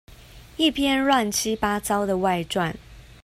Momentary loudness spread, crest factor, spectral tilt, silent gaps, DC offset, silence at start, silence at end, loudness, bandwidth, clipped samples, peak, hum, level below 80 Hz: 8 LU; 18 dB; -3.5 dB/octave; none; under 0.1%; 0.1 s; 0.2 s; -23 LUFS; 16 kHz; under 0.1%; -6 dBFS; none; -48 dBFS